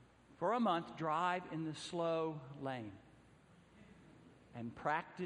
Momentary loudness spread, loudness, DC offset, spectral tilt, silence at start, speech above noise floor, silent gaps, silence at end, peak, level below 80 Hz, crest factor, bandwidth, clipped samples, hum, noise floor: 14 LU; -40 LUFS; under 0.1%; -6 dB/octave; 0 s; 26 dB; none; 0 s; -22 dBFS; -76 dBFS; 18 dB; 11 kHz; under 0.1%; none; -65 dBFS